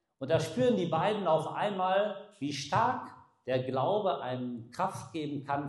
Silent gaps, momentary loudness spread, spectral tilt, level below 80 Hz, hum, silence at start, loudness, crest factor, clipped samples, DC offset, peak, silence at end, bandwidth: none; 10 LU; -6 dB/octave; -72 dBFS; none; 0.2 s; -31 LUFS; 16 dB; under 0.1%; under 0.1%; -14 dBFS; 0 s; 12.5 kHz